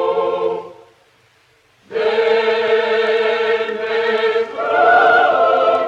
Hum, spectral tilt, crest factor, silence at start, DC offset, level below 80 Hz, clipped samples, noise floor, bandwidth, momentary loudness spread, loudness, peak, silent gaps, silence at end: none; -4 dB/octave; 14 dB; 0 s; under 0.1%; -68 dBFS; under 0.1%; -55 dBFS; 7.8 kHz; 9 LU; -15 LUFS; -2 dBFS; none; 0 s